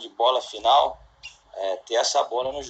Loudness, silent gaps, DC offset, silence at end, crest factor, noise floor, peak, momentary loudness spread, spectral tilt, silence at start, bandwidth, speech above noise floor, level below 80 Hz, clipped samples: -23 LUFS; none; under 0.1%; 0 s; 16 dB; -47 dBFS; -8 dBFS; 21 LU; -0.5 dB/octave; 0 s; 9 kHz; 24 dB; -58 dBFS; under 0.1%